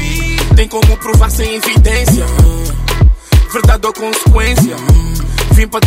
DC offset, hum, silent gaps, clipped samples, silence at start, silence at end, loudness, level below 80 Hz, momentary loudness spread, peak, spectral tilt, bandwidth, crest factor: under 0.1%; none; none; under 0.1%; 0 s; 0 s; -11 LUFS; -12 dBFS; 5 LU; 0 dBFS; -5 dB/octave; 16.5 kHz; 8 dB